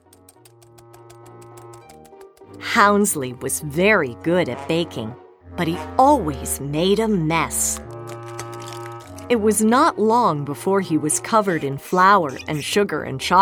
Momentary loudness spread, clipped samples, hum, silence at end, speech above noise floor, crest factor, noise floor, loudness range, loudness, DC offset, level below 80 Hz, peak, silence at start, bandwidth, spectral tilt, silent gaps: 17 LU; under 0.1%; none; 0 s; 31 dB; 18 dB; -50 dBFS; 4 LU; -19 LUFS; under 0.1%; -46 dBFS; -2 dBFS; 1.1 s; over 20 kHz; -4 dB/octave; none